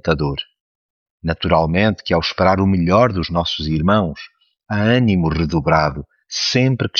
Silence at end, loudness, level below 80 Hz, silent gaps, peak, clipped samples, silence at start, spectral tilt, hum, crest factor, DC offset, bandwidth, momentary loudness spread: 0 s; -17 LUFS; -36 dBFS; 0.60-1.18 s; -2 dBFS; under 0.1%; 0.05 s; -6 dB/octave; none; 16 dB; under 0.1%; 7.2 kHz; 10 LU